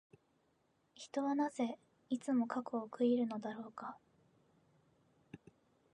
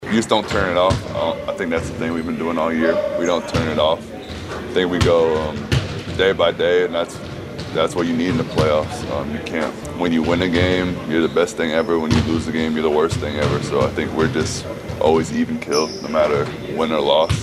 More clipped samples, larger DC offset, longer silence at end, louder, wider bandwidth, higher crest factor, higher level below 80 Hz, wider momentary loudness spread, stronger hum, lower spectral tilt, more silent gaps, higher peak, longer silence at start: neither; neither; first, 0.55 s vs 0 s; second, -39 LUFS vs -19 LUFS; second, 10.5 kHz vs 13.5 kHz; about the same, 18 dB vs 18 dB; second, -88 dBFS vs -38 dBFS; first, 22 LU vs 8 LU; neither; about the same, -5.5 dB/octave vs -5.5 dB/octave; neither; second, -22 dBFS vs 0 dBFS; first, 1 s vs 0 s